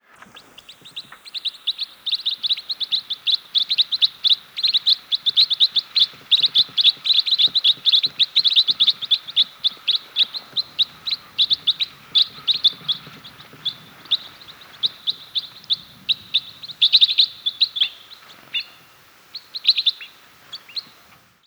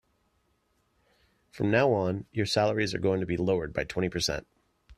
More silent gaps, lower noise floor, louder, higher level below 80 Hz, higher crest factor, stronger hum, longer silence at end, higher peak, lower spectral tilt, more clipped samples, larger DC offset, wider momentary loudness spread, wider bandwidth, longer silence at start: neither; second, -52 dBFS vs -72 dBFS; first, -18 LUFS vs -28 LUFS; second, -70 dBFS vs -54 dBFS; about the same, 20 dB vs 20 dB; neither; first, 0.65 s vs 0.05 s; first, -2 dBFS vs -10 dBFS; second, 0 dB/octave vs -5 dB/octave; neither; neither; first, 14 LU vs 7 LU; first, over 20 kHz vs 14 kHz; second, 0.35 s vs 1.55 s